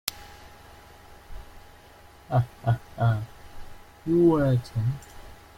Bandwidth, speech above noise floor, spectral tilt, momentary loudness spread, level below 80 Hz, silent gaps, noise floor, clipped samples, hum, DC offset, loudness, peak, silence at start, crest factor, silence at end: 16.5 kHz; 27 dB; -7.5 dB/octave; 27 LU; -48 dBFS; none; -51 dBFS; under 0.1%; none; under 0.1%; -26 LUFS; -6 dBFS; 0.05 s; 22 dB; 0.25 s